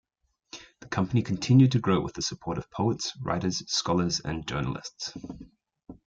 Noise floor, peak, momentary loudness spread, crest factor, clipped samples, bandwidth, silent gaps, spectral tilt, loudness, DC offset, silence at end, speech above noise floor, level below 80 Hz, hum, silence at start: -72 dBFS; -8 dBFS; 22 LU; 20 dB; under 0.1%; 7.8 kHz; none; -5.5 dB/octave; -27 LUFS; under 0.1%; 0.15 s; 46 dB; -54 dBFS; none; 0.55 s